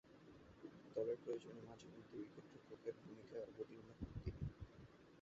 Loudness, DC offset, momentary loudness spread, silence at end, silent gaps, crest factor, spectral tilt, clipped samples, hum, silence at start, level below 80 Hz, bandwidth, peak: -53 LUFS; under 0.1%; 16 LU; 0 s; none; 20 dB; -7.5 dB/octave; under 0.1%; none; 0.05 s; -64 dBFS; 7.6 kHz; -32 dBFS